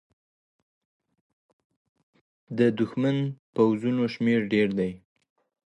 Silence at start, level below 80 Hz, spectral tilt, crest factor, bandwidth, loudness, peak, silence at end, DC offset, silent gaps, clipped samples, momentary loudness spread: 2.5 s; -66 dBFS; -8 dB/octave; 20 dB; 8.6 kHz; -25 LUFS; -8 dBFS; 0.75 s; under 0.1%; 3.39-3.53 s; under 0.1%; 7 LU